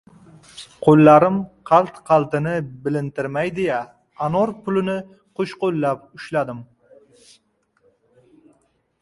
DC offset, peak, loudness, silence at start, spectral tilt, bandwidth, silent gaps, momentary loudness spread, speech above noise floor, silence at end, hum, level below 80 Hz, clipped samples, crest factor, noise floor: under 0.1%; 0 dBFS; -19 LUFS; 0.55 s; -8 dB/octave; 11.5 kHz; none; 17 LU; 46 dB; 2.4 s; none; -58 dBFS; under 0.1%; 20 dB; -64 dBFS